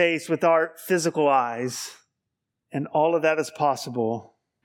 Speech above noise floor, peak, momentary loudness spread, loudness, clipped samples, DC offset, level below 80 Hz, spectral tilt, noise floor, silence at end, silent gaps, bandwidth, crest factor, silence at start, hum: 59 dB; -6 dBFS; 12 LU; -24 LUFS; under 0.1%; under 0.1%; -80 dBFS; -4.5 dB/octave; -82 dBFS; 0.4 s; none; 18 kHz; 18 dB; 0 s; none